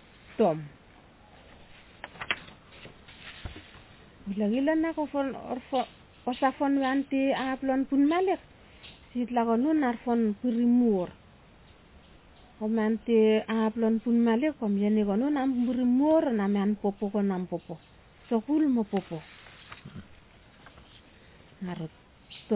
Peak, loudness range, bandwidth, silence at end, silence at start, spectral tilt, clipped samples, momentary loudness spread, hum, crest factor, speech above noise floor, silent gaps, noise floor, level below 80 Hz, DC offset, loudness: -12 dBFS; 11 LU; 4 kHz; 0 s; 0.3 s; -5.5 dB/octave; under 0.1%; 22 LU; none; 18 dB; 29 dB; none; -55 dBFS; -58 dBFS; under 0.1%; -28 LUFS